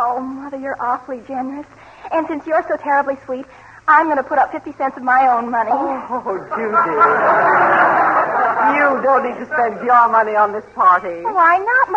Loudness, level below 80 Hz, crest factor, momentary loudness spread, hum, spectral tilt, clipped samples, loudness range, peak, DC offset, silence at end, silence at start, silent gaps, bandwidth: -16 LUFS; -58 dBFS; 14 dB; 13 LU; none; -6.5 dB/octave; under 0.1%; 7 LU; -2 dBFS; under 0.1%; 0 s; 0 s; none; 8.2 kHz